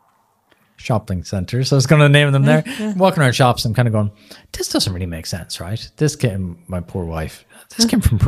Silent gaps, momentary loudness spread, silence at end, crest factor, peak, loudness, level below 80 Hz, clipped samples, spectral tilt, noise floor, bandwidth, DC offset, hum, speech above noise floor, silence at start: none; 15 LU; 0 s; 16 dB; 0 dBFS; -17 LUFS; -36 dBFS; under 0.1%; -5.5 dB/octave; -60 dBFS; 15 kHz; under 0.1%; none; 43 dB; 0.8 s